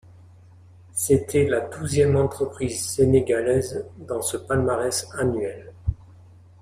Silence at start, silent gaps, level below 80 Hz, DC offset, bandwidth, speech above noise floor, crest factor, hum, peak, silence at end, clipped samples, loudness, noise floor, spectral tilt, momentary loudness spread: 0.95 s; none; -44 dBFS; under 0.1%; 15.5 kHz; 26 dB; 18 dB; none; -6 dBFS; 0.65 s; under 0.1%; -23 LUFS; -49 dBFS; -5.5 dB/octave; 12 LU